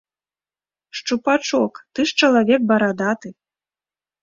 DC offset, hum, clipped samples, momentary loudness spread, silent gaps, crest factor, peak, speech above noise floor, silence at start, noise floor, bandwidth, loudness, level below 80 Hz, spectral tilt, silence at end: under 0.1%; none; under 0.1%; 13 LU; none; 18 dB; -2 dBFS; over 72 dB; 0.95 s; under -90 dBFS; 7.6 kHz; -19 LUFS; -64 dBFS; -4 dB/octave; 0.9 s